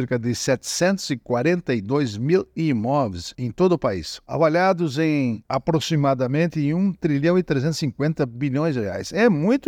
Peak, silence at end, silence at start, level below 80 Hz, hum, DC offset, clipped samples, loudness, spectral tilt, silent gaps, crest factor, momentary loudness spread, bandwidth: -6 dBFS; 0 s; 0 s; -54 dBFS; none; under 0.1%; under 0.1%; -22 LUFS; -6 dB/octave; none; 16 dB; 6 LU; 16 kHz